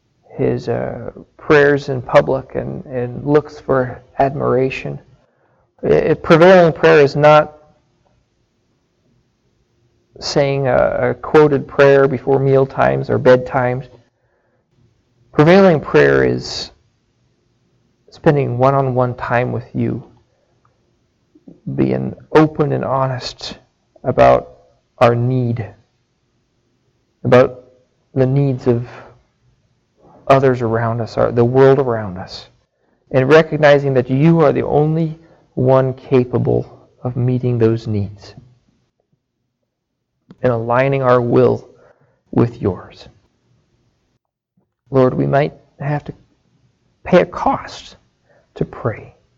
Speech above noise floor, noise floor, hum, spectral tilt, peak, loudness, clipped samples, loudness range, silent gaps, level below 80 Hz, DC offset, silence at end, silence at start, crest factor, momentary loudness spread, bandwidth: 60 dB; -74 dBFS; none; -7.5 dB/octave; 0 dBFS; -15 LUFS; under 0.1%; 8 LU; none; -46 dBFS; under 0.1%; 0.35 s; 0.35 s; 16 dB; 16 LU; 7.6 kHz